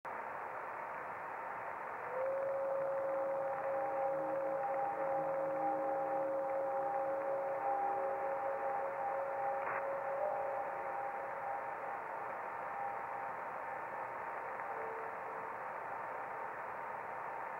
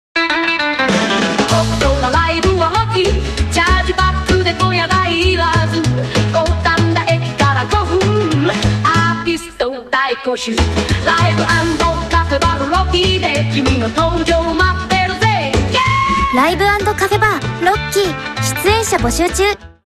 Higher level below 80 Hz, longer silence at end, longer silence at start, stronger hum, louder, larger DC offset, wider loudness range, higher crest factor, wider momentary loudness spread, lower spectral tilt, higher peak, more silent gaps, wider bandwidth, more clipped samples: second, -82 dBFS vs -26 dBFS; second, 0 s vs 0.3 s; about the same, 0.05 s vs 0.15 s; neither; second, -40 LUFS vs -14 LUFS; neither; first, 6 LU vs 1 LU; about the same, 14 dB vs 14 dB; first, 7 LU vs 3 LU; first, -6.5 dB/octave vs -4.5 dB/octave; second, -26 dBFS vs 0 dBFS; neither; about the same, 15.5 kHz vs 14.5 kHz; neither